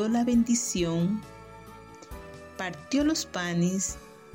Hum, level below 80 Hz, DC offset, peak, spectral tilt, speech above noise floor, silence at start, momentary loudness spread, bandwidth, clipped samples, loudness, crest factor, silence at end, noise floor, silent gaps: none; -50 dBFS; under 0.1%; -14 dBFS; -4.5 dB/octave; 20 dB; 0 s; 22 LU; 16.5 kHz; under 0.1%; -27 LUFS; 14 dB; 0 s; -47 dBFS; none